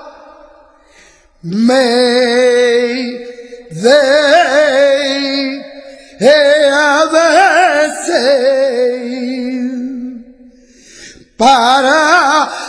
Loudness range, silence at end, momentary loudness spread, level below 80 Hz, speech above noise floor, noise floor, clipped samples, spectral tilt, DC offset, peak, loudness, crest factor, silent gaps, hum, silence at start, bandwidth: 5 LU; 0 s; 14 LU; -54 dBFS; 36 dB; -45 dBFS; under 0.1%; -3 dB/octave; under 0.1%; 0 dBFS; -10 LUFS; 12 dB; none; none; 0 s; 10.5 kHz